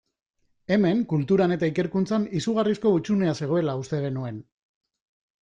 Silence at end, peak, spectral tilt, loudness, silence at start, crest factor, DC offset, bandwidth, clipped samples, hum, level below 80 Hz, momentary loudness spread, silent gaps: 1 s; -10 dBFS; -7.5 dB/octave; -24 LUFS; 0.7 s; 16 dB; under 0.1%; 9.6 kHz; under 0.1%; none; -60 dBFS; 8 LU; none